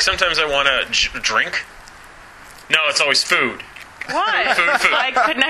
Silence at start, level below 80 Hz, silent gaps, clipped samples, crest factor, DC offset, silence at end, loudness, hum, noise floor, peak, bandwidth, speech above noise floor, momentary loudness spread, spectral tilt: 0 s; -44 dBFS; none; under 0.1%; 18 dB; under 0.1%; 0 s; -16 LUFS; none; -41 dBFS; -2 dBFS; 15.5 kHz; 23 dB; 11 LU; -0.5 dB/octave